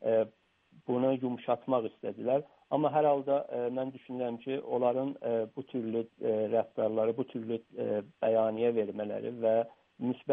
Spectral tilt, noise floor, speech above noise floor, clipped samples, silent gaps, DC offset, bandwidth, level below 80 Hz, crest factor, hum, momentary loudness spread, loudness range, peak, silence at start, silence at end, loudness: -10 dB/octave; -64 dBFS; 32 dB; under 0.1%; none; under 0.1%; 3.8 kHz; -80 dBFS; 16 dB; none; 9 LU; 2 LU; -14 dBFS; 0 s; 0 s; -32 LUFS